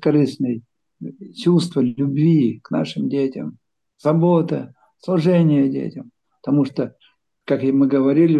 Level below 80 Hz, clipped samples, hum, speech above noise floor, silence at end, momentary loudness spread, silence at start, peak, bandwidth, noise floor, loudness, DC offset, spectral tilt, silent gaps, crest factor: -66 dBFS; under 0.1%; none; 40 dB; 0 s; 18 LU; 0 s; -6 dBFS; 10 kHz; -58 dBFS; -19 LUFS; under 0.1%; -8.5 dB/octave; none; 14 dB